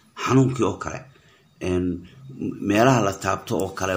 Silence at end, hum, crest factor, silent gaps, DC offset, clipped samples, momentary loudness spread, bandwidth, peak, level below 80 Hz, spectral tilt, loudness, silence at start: 0 s; none; 20 dB; none; under 0.1%; under 0.1%; 15 LU; 16 kHz; -4 dBFS; -52 dBFS; -6 dB/octave; -23 LUFS; 0.15 s